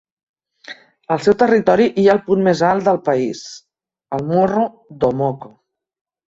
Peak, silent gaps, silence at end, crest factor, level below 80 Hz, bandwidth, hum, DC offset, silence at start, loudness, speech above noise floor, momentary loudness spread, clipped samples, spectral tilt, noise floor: -2 dBFS; none; 0.85 s; 16 dB; -54 dBFS; 8 kHz; none; under 0.1%; 0.7 s; -16 LUFS; 24 dB; 20 LU; under 0.1%; -6.5 dB/octave; -40 dBFS